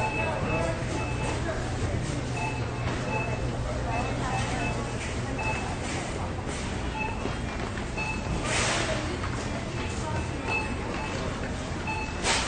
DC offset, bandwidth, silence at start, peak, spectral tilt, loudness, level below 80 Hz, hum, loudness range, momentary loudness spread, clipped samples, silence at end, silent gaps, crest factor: under 0.1%; 10 kHz; 0 s; -10 dBFS; -4.5 dB/octave; -30 LUFS; -38 dBFS; none; 2 LU; 5 LU; under 0.1%; 0 s; none; 20 dB